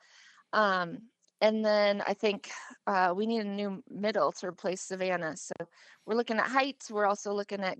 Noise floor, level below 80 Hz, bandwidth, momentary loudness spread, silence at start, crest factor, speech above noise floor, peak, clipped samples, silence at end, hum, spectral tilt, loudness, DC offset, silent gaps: -59 dBFS; -88 dBFS; 9 kHz; 12 LU; 0.55 s; 20 dB; 29 dB; -10 dBFS; under 0.1%; 0.05 s; none; -4 dB/octave; -31 LUFS; under 0.1%; none